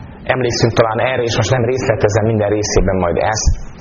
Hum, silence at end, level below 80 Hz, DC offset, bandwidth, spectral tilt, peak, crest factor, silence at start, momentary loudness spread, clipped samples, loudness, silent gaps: none; 0 s; -24 dBFS; under 0.1%; 7.4 kHz; -5 dB/octave; 0 dBFS; 14 dB; 0 s; 3 LU; under 0.1%; -15 LUFS; none